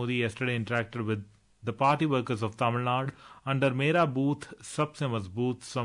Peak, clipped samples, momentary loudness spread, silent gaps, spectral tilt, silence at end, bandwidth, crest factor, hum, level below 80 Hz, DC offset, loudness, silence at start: -12 dBFS; under 0.1%; 11 LU; none; -6.5 dB/octave; 0 s; 11 kHz; 18 dB; none; -66 dBFS; under 0.1%; -29 LUFS; 0 s